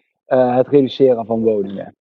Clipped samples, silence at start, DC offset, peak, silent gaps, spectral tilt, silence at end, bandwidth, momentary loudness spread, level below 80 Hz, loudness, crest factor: under 0.1%; 0.3 s; under 0.1%; 0 dBFS; none; -9 dB/octave; 0.3 s; 5.8 kHz; 10 LU; -58 dBFS; -16 LUFS; 16 dB